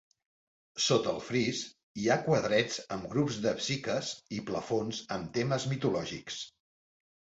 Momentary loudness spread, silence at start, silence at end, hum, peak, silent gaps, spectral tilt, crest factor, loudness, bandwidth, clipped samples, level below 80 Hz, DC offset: 11 LU; 0.75 s; 0.9 s; none; -14 dBFS; 1.83-1.95 s; -4.5 dB/octave; 20 dB; -32 LUFS; 8.2 kHz; under 0.1%; -64 dBFS; under 0.1%